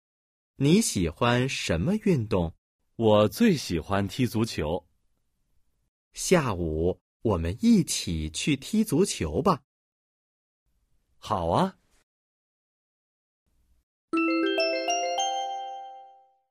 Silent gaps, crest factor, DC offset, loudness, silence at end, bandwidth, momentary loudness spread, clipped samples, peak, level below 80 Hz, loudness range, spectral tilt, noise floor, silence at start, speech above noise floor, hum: 2.58-2.79 s, 5.88-6.11 s, 7.01-7.20 s, 9.64-10.66 s, 12.03-13.46 s, 13.83-14.08 s; 20 dB; under 0.1%; -26 LUFS; 0.45 s; 15.5 kHz; 10 LU; under 0.1%; -8 dBFS; -48 dBFS; 8 LU; -5 dB/octave; -71 dBFS; 0.6 s; 47 dB; none